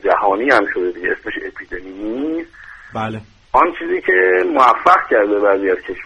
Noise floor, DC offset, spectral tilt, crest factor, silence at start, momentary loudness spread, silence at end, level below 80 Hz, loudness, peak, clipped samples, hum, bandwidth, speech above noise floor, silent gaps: -39 dBFS; under 0.1%; -6 dB/octave; 16 dB; 0.05 s; 15 LU; 0 s; -48 dBFS; -15 LUFS; 0 dBFS; under 0.1%; none; 10 kHz; 24 dB; none